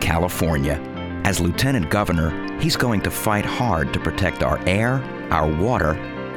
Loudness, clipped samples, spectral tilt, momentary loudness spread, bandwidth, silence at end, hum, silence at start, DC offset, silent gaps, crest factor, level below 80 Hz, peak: -21 LUFS; under 0.1%; -5.5 dB/octave; 5 LU; 19 kHz; 0 s; none; 0 s; under 0.1%; none; 20 dB; -34 dBFS; -2 dBFS